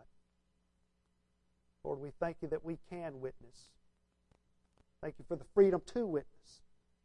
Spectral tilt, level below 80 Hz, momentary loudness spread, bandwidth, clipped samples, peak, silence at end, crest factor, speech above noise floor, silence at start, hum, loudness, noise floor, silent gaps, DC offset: -7.5 dB/octave; -64 dBFS; 18 LU; 10 kHz; under 0.1%; -16 dBFS; 0.75 s; 24 dB; 41 dB; 1.85 s; 60 Hz at -75 dBFS; -37 LUFS; -78 dBFS; none; under 0.1%